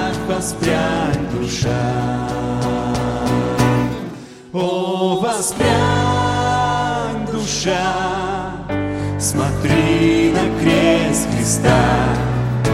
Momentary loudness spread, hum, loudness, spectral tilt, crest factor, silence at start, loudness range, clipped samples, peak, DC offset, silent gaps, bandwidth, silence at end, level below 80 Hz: 8 LU; none; -18 LUFS; -5 dB/octave; 16 dB; 0 s; 4 LU; under 0.1%; -2 dBFS; under 0.1%; none; 15.5 kHz; 0 s; -34 dBFS